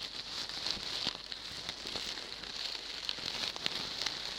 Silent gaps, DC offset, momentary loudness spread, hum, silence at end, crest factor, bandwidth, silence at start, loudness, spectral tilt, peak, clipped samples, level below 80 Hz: none; under 0.1%; 5 LU; none; 0 s; 30 dB; 18 kHz; 0 s; -37 LUFS; -1 dB/octave; -10 dBFS; under 0.1%; -62 dBFS